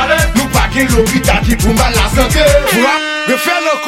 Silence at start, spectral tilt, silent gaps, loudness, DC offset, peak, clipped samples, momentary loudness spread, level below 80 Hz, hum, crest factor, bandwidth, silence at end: 0 s; -4 dB/octave; none; -11 LUFS; under 0.1%; 0 dBFS; under 0.1%; 3 LU; -18 dBFS; none; 10 dB; 17 kHz; 0 s